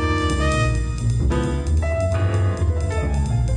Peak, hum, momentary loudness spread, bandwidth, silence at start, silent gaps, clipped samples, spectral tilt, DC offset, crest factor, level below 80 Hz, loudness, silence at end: -8 dBFS; none; 3 LU; 10 kHz; 0 s; none; under 0.1%; -6.5 dB/octave; under 0.1%; 12 dB; -24 dBFS; -21 LUFS; 0 s